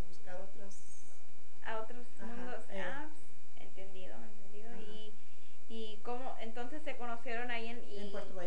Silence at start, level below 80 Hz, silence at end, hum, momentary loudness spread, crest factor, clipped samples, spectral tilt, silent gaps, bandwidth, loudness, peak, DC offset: 0 s; -72 dBFS; 0 s; none; 17 LU; 20 dB; under 0.1%; -5.5 dB/octave; none; 10 kHz; -46 LUFS; -22 dBFS; 6%